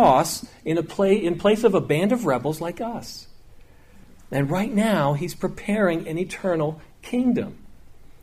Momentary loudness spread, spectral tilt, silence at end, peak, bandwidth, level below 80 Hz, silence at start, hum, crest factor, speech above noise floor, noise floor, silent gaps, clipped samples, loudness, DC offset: 11 LU; -6 dB/octave; 0.1 s; -6 dBFS; 15.5 kHz; -50 dBFS; 0 s; none; 18 dB; 25 dB; -47 dBFS; none; under 0.1%; -23 LUFS; under 0.1%